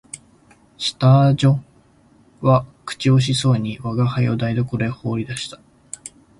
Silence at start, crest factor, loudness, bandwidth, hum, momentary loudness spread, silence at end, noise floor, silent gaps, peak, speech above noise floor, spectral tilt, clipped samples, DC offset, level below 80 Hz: 0.15 s; 16 dB; -19 LUFS; 11.5 kHz; none; 20 LU; 0.3 s; -53 dBFS; none; -4 dBFS; 36 dB; -6.5 dB/octave; under 0.1%; under 0.1%; -50 dBFS